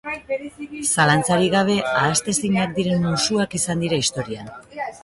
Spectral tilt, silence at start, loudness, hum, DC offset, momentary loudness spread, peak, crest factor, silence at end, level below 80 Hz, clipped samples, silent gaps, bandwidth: -4 dB/octave; 0.05 s; -20 LUFS; none; under 0.1%; 14 LU; -4 dBFS; 18 dB; 0.05 s; -52 dBFS; under 0.1%; none; 12 kHz